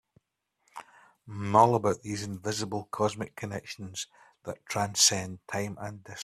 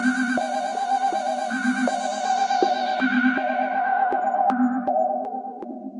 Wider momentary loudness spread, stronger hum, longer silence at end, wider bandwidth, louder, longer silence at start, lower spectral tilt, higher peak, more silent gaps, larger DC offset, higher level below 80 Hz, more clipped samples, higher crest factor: first, 22 LU vs 5 LU; neither; about the same, 0 s vs 0 s; first, 15 kHz vs 11 kHz; second, -28 LUFS vs -23 LUFS; first, 0.75 s vs 0 s; about the same, -3 dB/octave vs -3.5 dB/octave; about the same, -6 dBFS vs -6 dBFS; neither; neither; first, -68 dBFS vs -74 dBFS; neither; first, 24 dB vs 18 dB